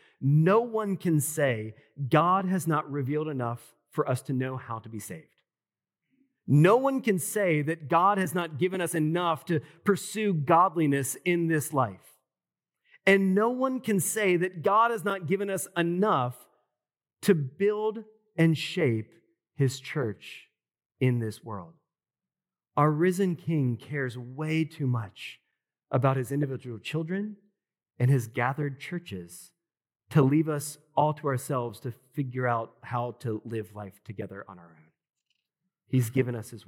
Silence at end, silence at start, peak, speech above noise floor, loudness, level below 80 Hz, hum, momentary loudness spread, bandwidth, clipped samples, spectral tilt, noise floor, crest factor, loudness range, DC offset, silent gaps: 0.1 s; 0.2 s; -8 dBFS; over 63 dB; -27 LUFS; -82 dBFS; none; 16 LU; 17 kHz; under 0.1%; -6 dB/octave; under -90 dBFS; 20 dB; 7 LU; under 0.1%; 20.86-20.90 s